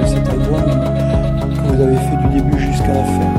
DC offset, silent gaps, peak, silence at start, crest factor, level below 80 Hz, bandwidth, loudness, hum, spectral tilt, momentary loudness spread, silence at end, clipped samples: under 0.1%; none; 0 dBFS; 0 s; 12 dB; -22 dBFS; 13.5 kHz; -15 LUFS; none; -8 dB/octave; 2 LU; 0 s; under 0.1%